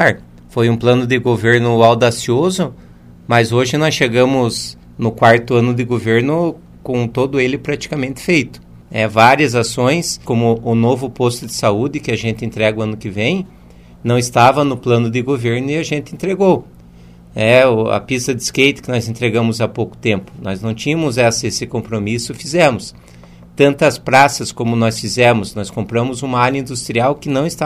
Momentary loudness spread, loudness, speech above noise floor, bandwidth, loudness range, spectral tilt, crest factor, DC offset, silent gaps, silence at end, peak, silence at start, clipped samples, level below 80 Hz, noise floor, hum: 11 LU; -15 LUFS; 25 dB; 15.5 kHz; 3 LU; -5 dB/octave; 16 dB; 0.1%; none; 0 s; 0 dBFS; 0 s; under 0.1%; -46 dBFS; -40 dBFS; none